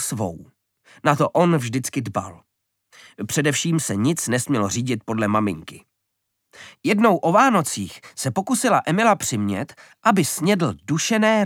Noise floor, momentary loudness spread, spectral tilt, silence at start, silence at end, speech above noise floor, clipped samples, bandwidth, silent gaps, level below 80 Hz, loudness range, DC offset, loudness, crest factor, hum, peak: -77 dBFS; 12 LU; -4.5 dB/octave; 0 s; 0 s; 56 dB; under 0.1%; 17.5 kHz; none; -62 dBFS; 4 LU; under 0.1%; -21 LUFS; 20 dB; none; -2 dBFS